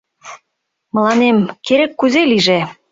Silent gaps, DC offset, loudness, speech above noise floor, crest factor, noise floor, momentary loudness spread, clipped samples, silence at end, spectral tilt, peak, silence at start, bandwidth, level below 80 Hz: none; under 0.1%; -14 LUFS; 60 dB; 14 dB; -73 dBFS; 5 LU; under 0.1%; 0.2 s; -5 dB/octave; -2 dBFS; 0.25 s; 7.8 kHz; -58 dBFS